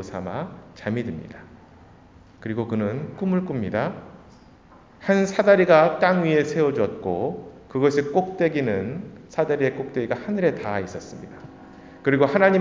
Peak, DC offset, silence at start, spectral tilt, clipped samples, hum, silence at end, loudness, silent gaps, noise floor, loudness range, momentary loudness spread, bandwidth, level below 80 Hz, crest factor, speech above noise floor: -4 dBFS; under 0.1%; 0 s; -7 dB/octave; under 0.1%; none; 0 s; -23 LUFS; none; -50 dBFS; 8 LU; 19 LU; 7.6 kHz; -54 dBFS; 20 dB; 28 dB